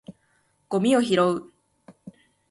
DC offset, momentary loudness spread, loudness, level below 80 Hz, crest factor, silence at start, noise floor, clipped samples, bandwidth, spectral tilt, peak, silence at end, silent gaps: under 0.1%; 10 LU; -23 LUFS; -68 dBFS; 18 dB; 0.1 s; -67 dBFS; under 0.1%; 11.5 kHz; -5.5 dB/octave; -8 dBFS; 0.4 s; none